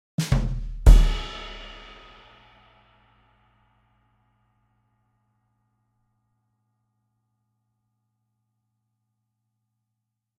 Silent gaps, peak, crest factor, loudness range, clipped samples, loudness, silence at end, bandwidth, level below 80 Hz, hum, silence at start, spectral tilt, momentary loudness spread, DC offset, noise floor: none; 0 dBFS; 26 dB; 23 LU; under 0.1%; -23 LUFS; 8.75 s; 12 kHz; -28 dBFS; none; 0.2 s; -6 dB/octave; 26 LU; under 0.1%; -82 dBFS